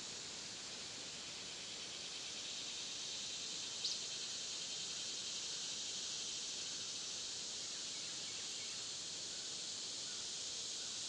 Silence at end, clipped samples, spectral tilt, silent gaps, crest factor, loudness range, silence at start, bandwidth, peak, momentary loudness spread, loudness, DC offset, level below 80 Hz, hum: 0 s; under 0.1%; 0.5 dB/octave; none; 18 dB; 2 LU; 0 s; 12 kHz; -28 dBFS; 4 LU; -43 LUFS; under 0.1%; -80 dBFS; none